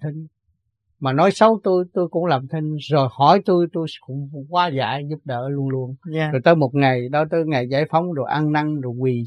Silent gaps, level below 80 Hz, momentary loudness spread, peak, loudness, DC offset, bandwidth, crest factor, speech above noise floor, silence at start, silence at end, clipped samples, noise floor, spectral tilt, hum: none; -66 dBFS; 12 LU; 0 dBFS; -20 LUFS; under 0.1%; 10 kHz; 20 dB; 51 dB; 0 s; 0 s; under 0.1%; -70 dBFS; -7.5 dB/octave; none